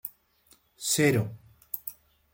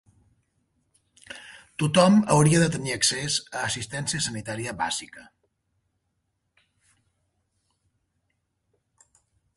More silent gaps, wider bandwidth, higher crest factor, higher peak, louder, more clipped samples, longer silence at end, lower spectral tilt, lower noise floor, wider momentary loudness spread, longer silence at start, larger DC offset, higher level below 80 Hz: neither; first, 17 kHz vs 11.5 kHz; about the same, 22 dB vs 22 dB; second, -10 dBFS vs -6 dBFS; second, -28 LUFS vs -23 LUFS; neither; second, 0.4 s vs 4.35 s; about the same, -4 dB/octave vs -4.5 dB/octave; second, -63 dBFS vs -76 dBFS; second, 17 LU vs 23 LU; second, 0.05 s vs 1.3 s; neither; second, -64 dBFS vs -58 dBFS